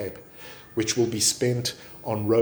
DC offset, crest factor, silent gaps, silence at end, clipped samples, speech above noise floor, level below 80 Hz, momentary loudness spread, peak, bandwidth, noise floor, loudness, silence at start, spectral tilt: under 0.1%; 16 dB; none; 0 s; under 0.1%; 20 dB; -58 dBFS; 20 LU; -10 dBFS; over 20 kHz; -44 dBFS; -25 LUFS; 0 s; -4 dB/octave